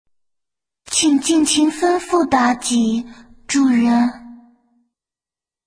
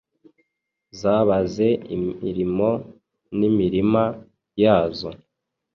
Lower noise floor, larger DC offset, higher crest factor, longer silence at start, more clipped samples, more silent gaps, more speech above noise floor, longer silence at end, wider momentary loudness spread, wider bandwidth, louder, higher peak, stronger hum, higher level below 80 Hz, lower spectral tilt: first, under -90 dBFS vs -79 dBFS; neither; about the same, 18 dB vs 18 dB; about the same, 0.9 s vs 0.95 s; neither; neither; first, over 74 dB vs 59 dB; first, 1.3 s vs 0.6 s; second, 7 LU vs 13 LU; first, 10.5 kHz vs 7.2 kHz; first, -16 LUFS vs -21 LUFS; first, 0 dBFS vs -4 dBFS; neither; about the same, -54 dBFS vs -50 dBFS; second, -2.5 dB/octave vs -8 dB/octave